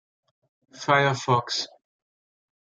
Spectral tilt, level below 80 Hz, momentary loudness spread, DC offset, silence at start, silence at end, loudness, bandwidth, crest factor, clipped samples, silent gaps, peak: -4 dB/octave; -72 dBFS; 12 LU; under 0.1%; 0.75 s; 1 s; -24 LUFS; 9.2 kHz; 22 dB; under 0.1%; none; -6 dBFS